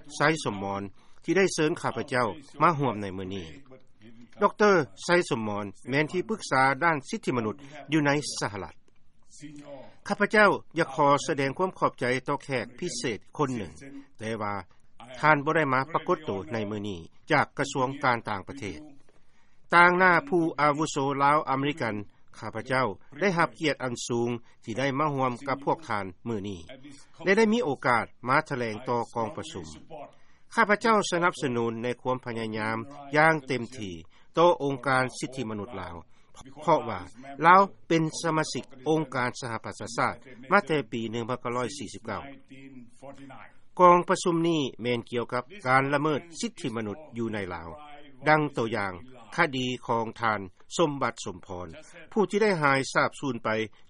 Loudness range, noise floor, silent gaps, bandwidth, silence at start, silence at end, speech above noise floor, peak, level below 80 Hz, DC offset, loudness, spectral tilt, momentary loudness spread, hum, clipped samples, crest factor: 5 LU; -50 dBFS; none; 11.5 kHz; 0 s; 0.05 s; 23 dB; -4 dBFS; -62 dBFS; under 0.1%; -27 LUFS; -5 dB/octave; 17 LU; none; under 0.1%; 24 dB